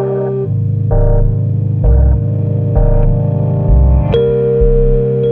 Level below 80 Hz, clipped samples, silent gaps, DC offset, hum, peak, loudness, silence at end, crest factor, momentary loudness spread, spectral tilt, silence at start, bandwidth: -14 dBFS; under 0.1%; none; under 0.1%; none; 0 dBFS; -13 LUFS; 0 s; 10 dB; 4 LU; -12 dB/octave; 0 s; 3.8 kHz